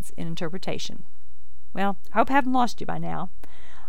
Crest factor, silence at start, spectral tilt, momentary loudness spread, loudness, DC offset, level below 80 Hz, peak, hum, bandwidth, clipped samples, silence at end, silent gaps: 22 dB; 0 s; -5.5 dB/octave; 16 LU; -27 LUFS; 10%; -54 dBFS; -6 dBFS; none; 18.5 kHz; under 0.1%; 0 s; none